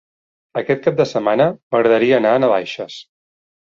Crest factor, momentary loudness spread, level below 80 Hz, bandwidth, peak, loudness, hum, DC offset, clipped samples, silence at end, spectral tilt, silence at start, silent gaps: 16 dB; 14 LU; -60 dBFS; 7.6 kHz; -2 dBFS; -16 LUFS; none; under 0.1%; under 0.1%; 0.6 s; -6.5 dB/octave; 0.55 s; 1.63-1.70 s